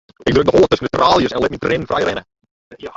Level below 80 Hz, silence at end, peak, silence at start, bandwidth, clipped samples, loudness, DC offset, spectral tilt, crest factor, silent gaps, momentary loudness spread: -40 dBFS; 0.05 s; 0 dBFS; 0.2 s; 7.8 kHz; under 0.1%; -15 LUFS; under 0.1%; -5.5 dB/octave; 16 dB; 2.51-2.71 s; 8 LU